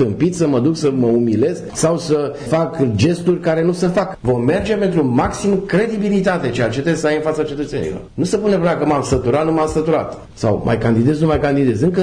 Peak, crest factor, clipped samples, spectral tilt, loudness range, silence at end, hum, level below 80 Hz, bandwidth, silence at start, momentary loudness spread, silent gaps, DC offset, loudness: -4 dBFS; 12 dB; under 0.1%; -6.5 dB/octave; 1 LU; 0 s; none; -40 dBFS; 10.5 kHz; 0 s; 5 LU; none; under 0.1%; -17 LUFS